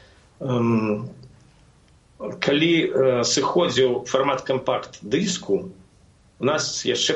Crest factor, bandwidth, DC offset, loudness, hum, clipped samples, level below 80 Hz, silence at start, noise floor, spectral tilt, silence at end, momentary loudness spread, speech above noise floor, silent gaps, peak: 18 dB; 8.2 kHz; under 0.1%; -22 LUFS; none; under 0.1%; -58 dBFS; 0.4 s; -55 dBFS; -4 dB/octave; 0 s; 10 LU; 33 dB; none; -6 dBFS